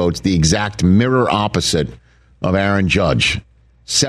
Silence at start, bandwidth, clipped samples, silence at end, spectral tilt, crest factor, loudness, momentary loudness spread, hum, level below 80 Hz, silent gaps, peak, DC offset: 0 s; 13.5 kHz; under 0.1%; 0 s; -4.5 dB/octave; 14 dB; -16 LUFS; 6 LU; none; -34 dBFS; none; -4 dBFS; under 0.1%